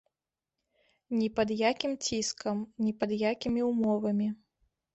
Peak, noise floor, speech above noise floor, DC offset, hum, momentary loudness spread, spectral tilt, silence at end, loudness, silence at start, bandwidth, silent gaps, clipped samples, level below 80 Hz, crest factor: -12 dBFS; under -90 dBFS; over 60 dB; under 0.1%; none; 6 LU; -4.5 dB/octave; 0.6 s; -31 LUFS; 1.1 s; 8.2 kHz; none; under 0.1%; -64 dBFS; 18 dB